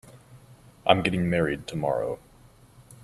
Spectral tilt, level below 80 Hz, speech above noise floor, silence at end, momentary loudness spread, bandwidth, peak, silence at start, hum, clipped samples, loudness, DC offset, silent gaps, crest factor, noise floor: -6 dB/octave; -54 dBFS; 29 dB; 0.1 s; 9 LU; 13.5 kHz; -4 dBFS; 0.05 s; none; under 0.1%; -26 LUFS; under 0.1%; none; 26 dB; -54 dBFS